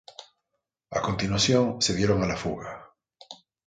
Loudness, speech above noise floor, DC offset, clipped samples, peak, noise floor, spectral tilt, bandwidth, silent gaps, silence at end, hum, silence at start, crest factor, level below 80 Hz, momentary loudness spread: -25 LUFS; 57 dB; under 0.1%; under 0.1%; -8 dBFS; -82 dBFS; -4.5 dB/octave; 9.6 kHz; none; 0.3 s; none; 0.2 s; 20 dB; -48 dBFS; 24 LU